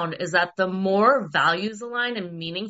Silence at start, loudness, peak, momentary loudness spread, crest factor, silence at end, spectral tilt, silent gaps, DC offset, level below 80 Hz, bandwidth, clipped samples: 0 s; -22 LUFS; -6 dBFS; 9 LU; 18 dB; 0 s; -2.5 dB/octave; none; under 0.1%; -70 dBFS; 8 kHz; under 0.1%